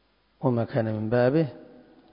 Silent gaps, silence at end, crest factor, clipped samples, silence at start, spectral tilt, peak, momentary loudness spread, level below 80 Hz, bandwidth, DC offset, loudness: none; 0.5 s; 18 dB; under 0.1%; 0.4 s; -12.5 dB/octave; -10 dBFS; 7 LU; -60 dBFS; 5.4 kHz; under 0.1%; -26 LUFS